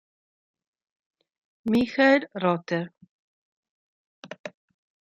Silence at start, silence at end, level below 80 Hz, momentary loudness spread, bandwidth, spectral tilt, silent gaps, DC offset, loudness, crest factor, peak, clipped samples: 1.65 s; 0.55 s; -68 dBFS; 21 LU; 9 kHz; -6.5 dB/octave; 3.09-3.63 s, 3.69-4.23 s, 4.39-4.44 s; under 0.1%; -24 LUFS; 22 dB; -6 dBFS; under 0.1%